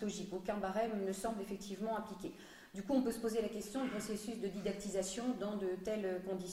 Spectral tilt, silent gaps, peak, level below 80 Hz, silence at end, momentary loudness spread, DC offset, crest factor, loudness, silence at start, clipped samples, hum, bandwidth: -5 dB/octave; none; -24 dBFS; -66 dBFS; 0 s; 7 LU; under 0.1%; 16 dB; -40 LUFS; 0 s; under 0.1%; none; 16 kHz